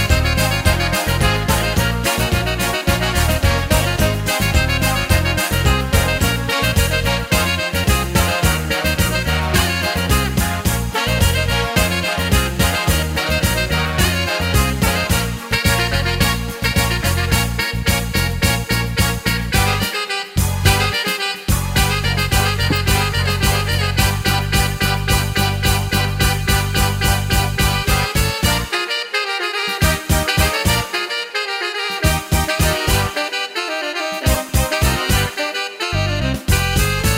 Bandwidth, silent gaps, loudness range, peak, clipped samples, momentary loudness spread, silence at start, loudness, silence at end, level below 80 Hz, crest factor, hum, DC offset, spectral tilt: 16.5 kHz; none; 2 LU; 0 dBFS; under 0.1%; 4 LU; 0 s; -17 LUFS; 0 s; -24 dBFS; 18 dB; none; under 0.1%; -4 dB/octave